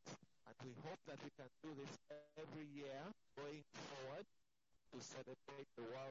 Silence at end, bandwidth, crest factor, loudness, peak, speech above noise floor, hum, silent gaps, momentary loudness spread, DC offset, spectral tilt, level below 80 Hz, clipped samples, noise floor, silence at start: 0 s; 8 kHz; 14 dB; -56 LUFS; -42 dBFS; 30 dB; none; none; 6 LU; under 0.1%; -4.5 dB/octave; -90 dBFS; under 0.1%; -85 dBFS; 0.05 s